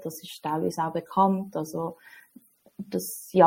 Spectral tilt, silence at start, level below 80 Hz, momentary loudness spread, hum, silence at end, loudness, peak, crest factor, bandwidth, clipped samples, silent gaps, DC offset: -6 dB/octave; 0 s; -72 dBFS; 13 LU; none; 0 s; -29 LUFS; -6 dBFS; 22 dB; 17 kHz; under 0.1%; none; under 0.1%